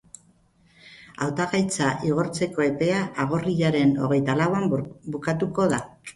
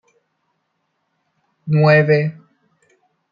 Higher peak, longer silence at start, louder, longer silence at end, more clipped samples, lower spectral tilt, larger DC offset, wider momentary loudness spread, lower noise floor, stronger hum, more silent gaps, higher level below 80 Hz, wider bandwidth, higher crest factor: second, -8 dBFS vs -2 dBFS; second, 0.85 s vs 1.65 s; second, -24 LUFS vs -15 LUFS; second, 0.05 s vs 1 s; neither; second, -6 dB/octave vs -9 dB/octave; neither; second, 8 LU vs 15 LU; second, -60 dBFS vs -71 dBFS; neither; neither; first, -56 dBFS vs -62 dBFS; first, 11.5 kHz vs 5.2 kHz; about the same, 16 dB vs 18 dB